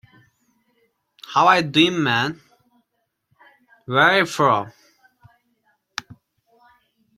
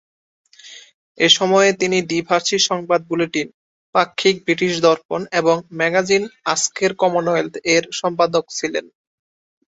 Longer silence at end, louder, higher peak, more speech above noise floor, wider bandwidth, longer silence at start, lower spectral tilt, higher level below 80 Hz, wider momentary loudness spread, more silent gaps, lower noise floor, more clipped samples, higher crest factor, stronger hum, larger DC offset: first, 1.05 s vs 0.9 s; about the same, -18 LUFS vs -18 LUFS; about the same, -2 dBFS vs 0 dBFS; first, 57 dB vs 25 dB; first, 15.5 kHz vs 8 kHz; first, 1.3 s vs 0.65 s; first, -4.5 dB/octave vs -3 dB/octave; about the same, -64 dBFS vs -62 dBFS; first, 19 LU vs 7 LU; second, none vs 0.94-1.15 s, 3.54-3.93 s, 5.05-5.09 s; first, -74 dBFS vs -42 dBFS; neither; about the same, 22 dB vs 20 dB; neither; neither